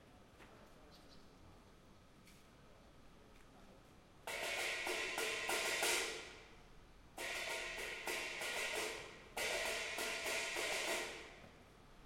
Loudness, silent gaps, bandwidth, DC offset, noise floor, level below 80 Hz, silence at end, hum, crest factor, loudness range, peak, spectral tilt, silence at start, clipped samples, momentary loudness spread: -41 LUFS; none; 16.5 kHz; under 0.1%; -63 dBFS; -68 dBFS; 0 s; none; 22 dB; 5 LU; -24 dBFS; -0.5 dB/octave; 0 s; under 0.1%; 24 LU